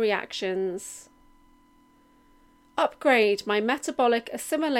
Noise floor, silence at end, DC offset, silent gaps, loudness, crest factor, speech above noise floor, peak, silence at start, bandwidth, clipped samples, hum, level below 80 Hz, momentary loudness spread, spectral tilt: -59 dBFS; 0 s; under 0.1%; none; -25 LUFS; 18 dB; 34 dB; -10 dBFS; 0 s; 16.5 kHz; under 0.1%; none; -66 dBFS; 14 LU; -3.5 dB/octave